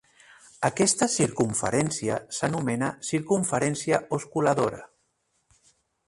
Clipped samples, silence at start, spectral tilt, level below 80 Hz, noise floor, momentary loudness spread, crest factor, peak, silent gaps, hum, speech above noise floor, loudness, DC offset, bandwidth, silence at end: under 0.1%; 0.6 s; -4.5 dB/octave; -60 dBFS; -73 dBFS; 7 LU; 20 dB; -6 dBFS; none; none; 47 dB; -26 LUFS; under 0.1%; 11.5 kHz; 1.2 s